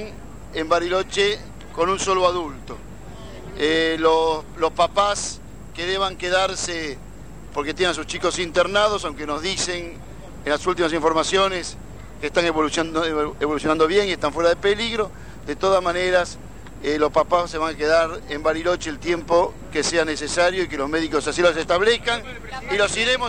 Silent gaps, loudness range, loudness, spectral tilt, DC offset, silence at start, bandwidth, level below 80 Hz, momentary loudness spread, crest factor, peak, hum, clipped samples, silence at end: none; 2 LU; -21 LUFS; -3 dB/octave; 0.9%; 0 s; 15 kHz; -42 dBFS; 17 LU; 18 dB; -4 dBFS; none; under 0.1%; 0 s